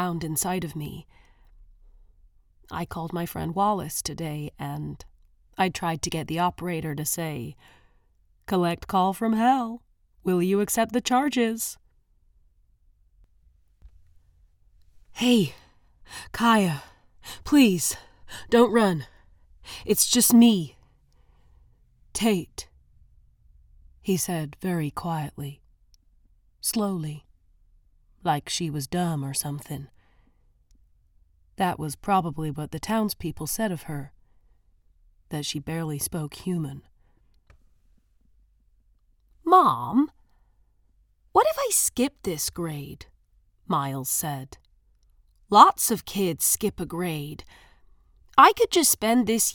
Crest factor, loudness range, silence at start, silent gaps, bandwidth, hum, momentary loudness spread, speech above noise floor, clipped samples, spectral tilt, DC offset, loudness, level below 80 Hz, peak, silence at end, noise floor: 26 dB; 10 LU; 0 s; none; 19 kHz; none; 20 LU; 39 dB; under 0.1%; -4 dB/octave; under 0.1%; -24 LUFS; -54 dBFS; 0 dBFS; 0 s; -63 dBFS